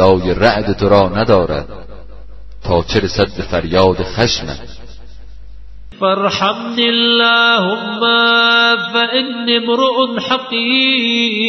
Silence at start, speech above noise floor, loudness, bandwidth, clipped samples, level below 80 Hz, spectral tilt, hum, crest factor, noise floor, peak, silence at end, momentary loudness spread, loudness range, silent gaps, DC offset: 0 s; 22 dB; -13 LUFS; 6.2 kHz; under 0.1%; -36 dBFS; -5 dB/octave; none; 14 dB; -35 dBFS; 0 dBFS; 0 s; 8 LU; 6 LU; none; 3%